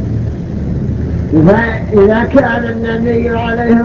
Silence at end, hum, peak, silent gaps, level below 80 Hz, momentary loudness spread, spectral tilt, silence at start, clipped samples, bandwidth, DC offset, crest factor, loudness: 0 s; none; 0 dBFS; none; -24 dBFS; 9 LU; -9 dB/octave; 0 s; 0.3%; 7 kHz; under 0.1%; 12 dB; -12 LUFS